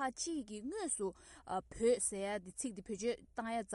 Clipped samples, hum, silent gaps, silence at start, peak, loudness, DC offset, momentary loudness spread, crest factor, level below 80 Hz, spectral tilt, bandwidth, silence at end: under 0.1%; none; none; 0 s; -22 dBFS; -39 LUFS; under 0.1%; 9 LU; 18 dB; -66 dBFS; -3 dB/octave; 11.5 kHz; 0 s